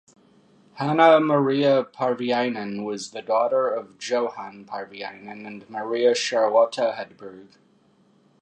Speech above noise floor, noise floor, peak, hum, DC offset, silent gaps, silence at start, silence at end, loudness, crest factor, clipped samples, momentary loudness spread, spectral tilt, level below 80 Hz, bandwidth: 37 dB; -60 dBFS; -2 dBFS; none; under 0.1%; none; 0.75 s; 1 s; -22 LUFS; 22 dB; under 0.1%; 18 LU; -5 dB/octave; -78 dBFS; 9.4 kHz